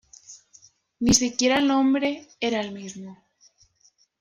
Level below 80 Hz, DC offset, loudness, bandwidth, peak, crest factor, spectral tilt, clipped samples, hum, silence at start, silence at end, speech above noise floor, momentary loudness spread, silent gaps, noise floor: -52 dBFS; under 0.1%; -22 LUFS; 13.5 kHz; -4 dBFS; 22 dB; -3 dB/octave; under 0.1%; none; 0.3 s; 1.05 s; 40 dB; 23 LU; none; -63 dBFS